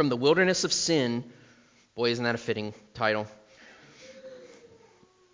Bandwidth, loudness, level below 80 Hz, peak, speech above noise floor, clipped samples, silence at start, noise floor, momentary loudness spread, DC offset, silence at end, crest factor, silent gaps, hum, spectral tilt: 7.8 kHz; -27 LUFS; -68 dBFS; -10 dBFS; 33 dB; under 0.1%; 0 s; -60 dBFS; 24 LU; under 0.1%; 0.8 s; 20 dB; none; none; -3.5 dB/octave